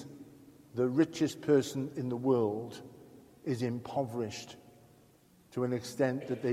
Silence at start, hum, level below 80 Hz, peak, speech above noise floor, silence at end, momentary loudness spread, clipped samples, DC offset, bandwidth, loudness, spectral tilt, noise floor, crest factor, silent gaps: 0 s; none; -72 dBFS; -16 dBFS; 31 dB; 0 s; 21 LU; under 0.1%; under 0.1%; 15.5 kHz; -33 LUFS; -6.5 dB/octave; -63 dBFS; 18 dB; none